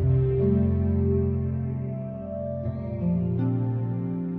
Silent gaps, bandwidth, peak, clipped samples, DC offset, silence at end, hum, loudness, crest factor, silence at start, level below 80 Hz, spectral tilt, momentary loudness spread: none; 3.1 kHz; -12 dBFS; under 0.1%; under 0.1%; 0 s; none; -26 LUFS; 12 dB; 0 s; -36 dBFS; -13.5 dB/octave; 9 LU